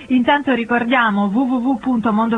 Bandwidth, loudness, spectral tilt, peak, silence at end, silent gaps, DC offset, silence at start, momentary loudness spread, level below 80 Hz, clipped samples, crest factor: 4 kHz; -17 LUFS; -7 dB/octave; -2 dBFS; 0 s; none; under 0.1%; 0 s; 3 LU; -52 dBFS; under 0.1%; 14 dB